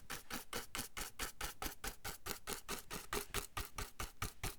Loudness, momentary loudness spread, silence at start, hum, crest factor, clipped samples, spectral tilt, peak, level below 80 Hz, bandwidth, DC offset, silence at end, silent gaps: -45 LUFS; 3 LU; 0 s; none; 28 dB; under 0.1%; -2 dB/octave; -18 dBFS; -54 dBFS; over 20 kHz; under 0.1%; 0 s; none